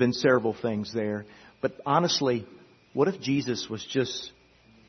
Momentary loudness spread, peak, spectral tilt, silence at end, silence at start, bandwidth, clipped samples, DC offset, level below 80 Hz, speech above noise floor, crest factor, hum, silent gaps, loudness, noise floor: 10 LU; -8 dBFS; -5 dB/octave; 0.6 s; 0 s; 6.4 kHz; under 0.1%; under 0.1%; -66 dBFS; 31 dB; 20 dB; none; none; -28 LUFS; -58 dBFS